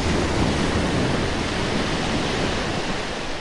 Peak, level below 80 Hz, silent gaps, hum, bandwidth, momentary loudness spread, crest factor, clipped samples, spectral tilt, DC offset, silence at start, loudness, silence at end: -8 dBFS; -34 dBFS; none; none; 11.5 kHz; 4 LU; 14 dB; under 0.1%; -5 dB/octave; under 0.1%; 0 s; -23 LUFS; 0 s